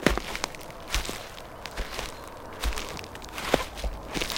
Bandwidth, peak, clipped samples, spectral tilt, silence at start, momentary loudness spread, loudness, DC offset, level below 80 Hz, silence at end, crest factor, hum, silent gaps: 17 kHz; -2 dBFS; under 0.1%; -3.5 dB/octave; 0 s; 12 LU; -33 LUFS; under 0.1%; -38 dBFS; 0 s; 30 dB; none; none